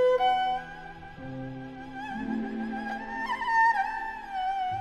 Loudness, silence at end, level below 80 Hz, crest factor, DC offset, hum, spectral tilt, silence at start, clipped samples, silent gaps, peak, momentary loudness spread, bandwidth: -29 LUFS; 0 s; -54 dBFS; 14 dB; under 0.1%; none; -5.5 dB/octave; 0 s; under 0.1%; none; -14 dBFS; 17 LU; 12.5 kHz